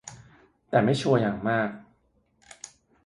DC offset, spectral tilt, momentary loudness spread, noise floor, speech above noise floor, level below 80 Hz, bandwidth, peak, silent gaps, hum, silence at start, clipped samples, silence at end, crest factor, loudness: under 0.1%; -6 dB/octave; 22 LU; -68 dBFS; 44 dB; -62 dBFS; 11.5 kHz; -8 dBFS; none; none; 0.05 s; under 0.1%; 1.25 s; 20 dB; -25 LUFS